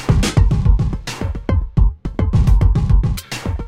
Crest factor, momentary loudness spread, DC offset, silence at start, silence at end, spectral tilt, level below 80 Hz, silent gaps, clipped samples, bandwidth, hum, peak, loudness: 14 dB; 9 LU; under 0.1%; 0 s; 0 s; -6.5 dB/octave; -18 dBFS; none; under 0.1%; 14.5 kHz; none; -2 dBFS; -18 LUFS